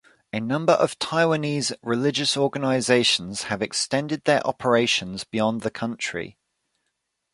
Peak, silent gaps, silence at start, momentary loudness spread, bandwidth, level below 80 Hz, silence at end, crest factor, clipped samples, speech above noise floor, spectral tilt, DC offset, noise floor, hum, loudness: -4 dBFS; none; 0.35 s; 9 LU; 11.5 kHz; -62 dBFS; 1 s; 20 dB; under 0.1%; 54 dB; -4 dB/octave; under 0.1%; -77 dBFS; none; -23 LUFS